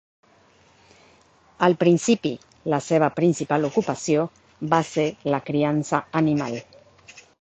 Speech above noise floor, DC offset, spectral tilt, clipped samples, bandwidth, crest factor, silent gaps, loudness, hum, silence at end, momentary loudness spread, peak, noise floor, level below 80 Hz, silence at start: 35 dB; under 0.1%; -6 dB/octave; under 0.1%; 9 kHz; 20 dB; none; -23 LUFS; none; 0.2 s; 10 LU; -4 dBFS; -57 dBFS; -62 dBFS; 1.6 s